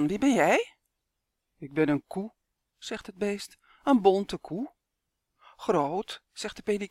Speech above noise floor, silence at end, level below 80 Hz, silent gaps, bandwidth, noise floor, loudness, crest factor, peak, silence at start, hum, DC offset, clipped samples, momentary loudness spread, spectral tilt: 56 dB; 0.05 s; -62 dBFS; none; 14.5 kHz; -83 dBFS; -28 LUFS; 22 dB; -8 dBFS; 0 s; none; under 0.1%; under 0.1%; 17 LU; -5.5 dB/octave